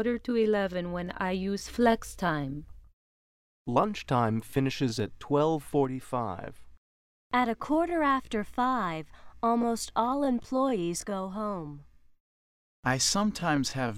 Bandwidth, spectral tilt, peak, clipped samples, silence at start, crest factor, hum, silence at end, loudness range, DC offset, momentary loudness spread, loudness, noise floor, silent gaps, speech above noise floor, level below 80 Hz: 16 kHz; -5 dB/octave; -10 dBFS; under 0.1%; 0 s; 20 dB; none; 0 s; 2 LU; under 0.1%; 9 LU; -29 LUFS; under -90 dBFS; 2.93-3.65 s, 6.77-7.30 s, 12.20-12.83 s; over 61 dB; -54 dBFS